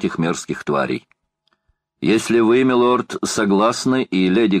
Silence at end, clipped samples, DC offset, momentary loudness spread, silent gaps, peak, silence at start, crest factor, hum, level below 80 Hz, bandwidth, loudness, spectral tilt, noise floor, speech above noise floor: 0 s; under 0.1%; under 0.1%; 9 LU; none; -4 dBFS; 0 s; 14 dB; none; -56 dBFS; 14.5 kHz; -18 LUFS; -5 dB/octave; -68 dBFS; 51 dB